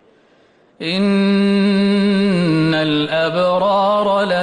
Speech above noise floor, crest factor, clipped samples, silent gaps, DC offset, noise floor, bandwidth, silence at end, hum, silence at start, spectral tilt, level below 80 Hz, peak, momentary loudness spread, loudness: 37 dB; 8 dB; under 0.1%; none; under 0.1%; -53 dBFS; 9.8 kHz; 0 s; none; 0.8 s; -7 dB/octave; -54 dBFS; -6 dBFS; 3 LU; -15 LUFS